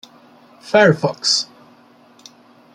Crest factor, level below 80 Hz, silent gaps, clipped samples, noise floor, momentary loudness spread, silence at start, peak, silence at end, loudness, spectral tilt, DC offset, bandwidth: 18 dB; -64 dBFS; none; under 0.1%; -49 dBFS; 5 LU; 0.65 s; -2 dBFS; 1.3 s; -15 LUFS; -3.5 dB/octave; under 0.1%; 12 kHz